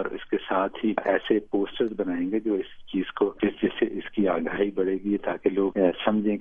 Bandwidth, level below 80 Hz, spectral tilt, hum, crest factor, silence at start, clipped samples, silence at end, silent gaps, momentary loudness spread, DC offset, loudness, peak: 3.8 kHz; -56 dBFS; -9 dB/octave; none; 18 dB; 0 s; under 0.1%; 0 s; none; 5 LU; under 0.1%; -26 LUFS; -8 dBFS